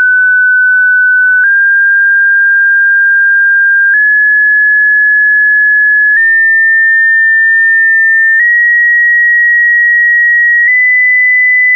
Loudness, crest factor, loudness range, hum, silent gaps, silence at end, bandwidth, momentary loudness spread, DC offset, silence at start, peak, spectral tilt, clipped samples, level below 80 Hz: -5 LUFS; 4 dB; 1 LU; none; none; 0 s; 2.4 kHz; 1 LU; 0.4%; 0 s; -4 dBFS; -1 dB/octave; under 0.1%; under -90 dBFS